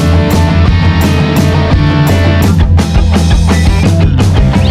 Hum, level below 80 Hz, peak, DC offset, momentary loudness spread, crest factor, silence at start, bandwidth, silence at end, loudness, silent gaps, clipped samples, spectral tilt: none; -12 dBFS; 0 dBFS; under 0.1%; 1 LU; 8 dB; 0 s; 16 kHz; 0 s; -9 LUFS; none; under 0.1%; -6.5 dB/octave